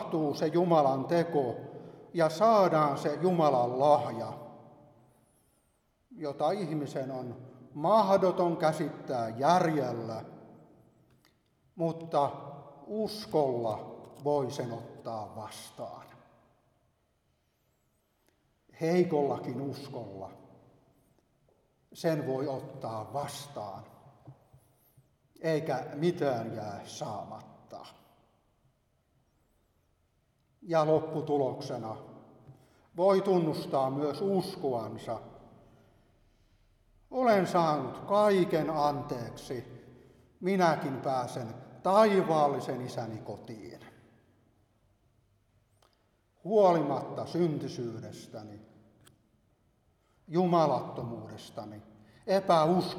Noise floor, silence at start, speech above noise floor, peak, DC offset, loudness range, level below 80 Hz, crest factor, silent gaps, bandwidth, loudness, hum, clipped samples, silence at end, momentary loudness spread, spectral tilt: -74 dBFS; 0 s; 44 dB; -10 dBFS; under 0.1%; 10 LU; -72 dBFS; 22 dB; none; 15.5 kHz; -30 LUFS; none; under 0.1%; 0 s; 19 LU; -6.5 dB/octave